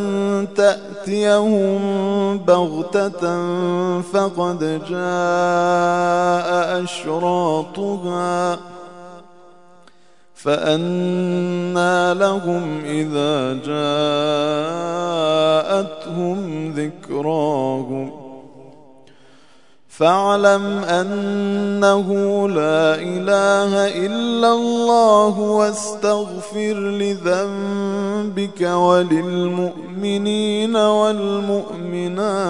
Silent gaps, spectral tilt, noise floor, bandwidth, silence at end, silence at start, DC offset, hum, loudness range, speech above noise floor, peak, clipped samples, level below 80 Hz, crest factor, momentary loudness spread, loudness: none; -5.5 dB/octave; -54 dBFS; 11 kHz; 0 s; 0 s; 0.4%; none; 6 LU; 36 dB; 0 dBFS; under 0.1%; -66 dBFS; 18 dB; 9 LU; -18 LUFS